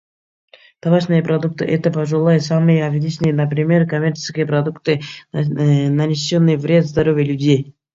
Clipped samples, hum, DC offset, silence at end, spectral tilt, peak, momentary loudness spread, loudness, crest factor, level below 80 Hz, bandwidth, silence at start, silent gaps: under 0.1%; none; under 0.1%; 0.25 s; -7 dB/octave; -2 dBFS; 6 LU; -17 LUFS; 14 dB; -52 dBFS; 7.6 kHz; 0.85 s; none